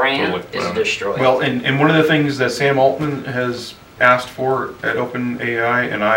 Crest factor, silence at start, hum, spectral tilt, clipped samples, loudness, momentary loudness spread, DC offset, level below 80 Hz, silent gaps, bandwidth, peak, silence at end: 16 dB; 0 s; none; -5.5 dB/octave; under 0.1%; -17 LUFS; 8 LU; under 0.1%; -54 dBFS; none; 17 kHz; 0 dBFS; 0 s